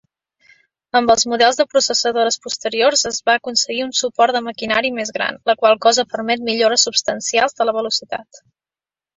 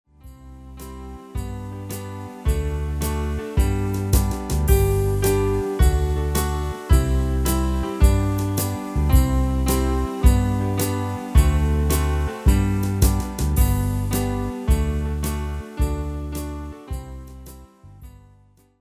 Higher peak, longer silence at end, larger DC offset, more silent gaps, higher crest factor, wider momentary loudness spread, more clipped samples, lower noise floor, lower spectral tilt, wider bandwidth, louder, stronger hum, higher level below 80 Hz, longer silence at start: about the same, -2 dBFS vs -2 dBFS; first, 0.95 s vs 0.7 s; neither; neither; about the same, 16 dB vs 20 dB; second, 7 LU vs 14 LU; neither; first, under -90 dBFS vs -54 dBFS; second, -1 dB/octave vs -6 dB/octave; second, 8.2 kHz vs 16 kHz; first, -16 LUFS vs -22 LUFS; neither; second, -60 dBFS vs -24 dBFS; first, 0.95 s vs 0.25 s